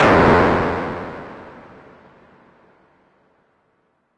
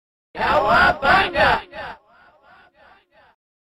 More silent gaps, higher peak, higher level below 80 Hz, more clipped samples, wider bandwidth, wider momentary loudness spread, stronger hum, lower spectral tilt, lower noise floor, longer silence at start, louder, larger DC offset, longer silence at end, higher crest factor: neither; about the same, -2 dBFS vs -4 dBFS; about the same, -40 dBFS vs -42 dBFS; neither; second, 11 kHz vs 15 kHz; first, 26 LU vs 20 LU; neither; first, -7 dB/octave vs -5 dB/octave; first, -65 dBFS vs -53 dBFS; second, 0 s vs 0.35 s; about the same, -16 LUFS vs -17 LUFS; neither; first, 2.7 s vs 1.8 s; about the same, 20 dB vs 16 dB